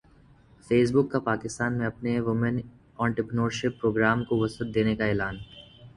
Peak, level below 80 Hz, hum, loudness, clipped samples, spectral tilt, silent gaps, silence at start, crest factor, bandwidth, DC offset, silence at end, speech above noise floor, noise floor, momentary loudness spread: -8 dBFS; -52 dBFS; none; -27 LUFS; under 0.1%; -6.5 dB/octave; none; 0.7 s; 20 dB; 11 kHz; under 0.1%; 0.05 s; 30 dB; -56 dBFS; 10 LU